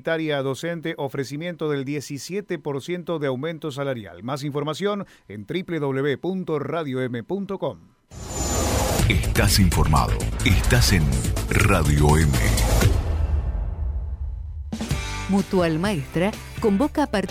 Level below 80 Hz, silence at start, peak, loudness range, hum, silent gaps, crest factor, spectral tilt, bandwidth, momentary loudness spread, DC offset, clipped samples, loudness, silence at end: -28 dBFS; 0.05 s; -4 dBFS; 8 LU; none; none; 18 dB; -5 dB/octave; 16.5 kHz; 12 LU; under 0.1%; under 0.1%; -23 LUFS; 0 s